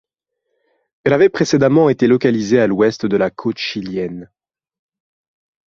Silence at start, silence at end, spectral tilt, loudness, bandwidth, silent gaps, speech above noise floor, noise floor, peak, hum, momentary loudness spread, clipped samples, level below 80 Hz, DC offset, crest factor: 1.05 s; 1.5 s; -6 dB/octave; -15 LUFS; 7.6 kHz; none; 60 dB; -75 dBFS; -2 dBFS; none; 10 LU; under 0.1%; -54 dBFS; under 0.1%; 16 dB